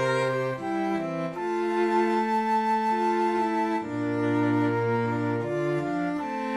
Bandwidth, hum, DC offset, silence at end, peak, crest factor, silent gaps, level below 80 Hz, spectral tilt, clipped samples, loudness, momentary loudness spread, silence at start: 12.5 kHz; none; under 0.1%; 0 s; -14 dBFS; 12 dB; none; -68 dBFS; -7 dB/octave; under 0.1%; -26 LUFS; 5 LU; 0 s